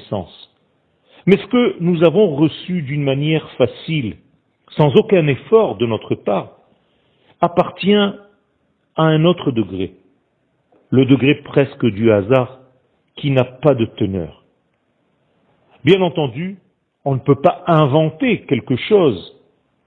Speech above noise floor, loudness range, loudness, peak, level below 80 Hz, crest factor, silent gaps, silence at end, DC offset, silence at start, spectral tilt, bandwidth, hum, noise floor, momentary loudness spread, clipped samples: 49 dB; 4 LU; -16 LUFS; 0 dBFS; -54 dBFS; 18 dB; none; 0.6 s; under 0.1%; 0.1 s; -9.5 dB/octave; 4.5 kHz; none; -64 dBFS; 13 LU; under 0.1%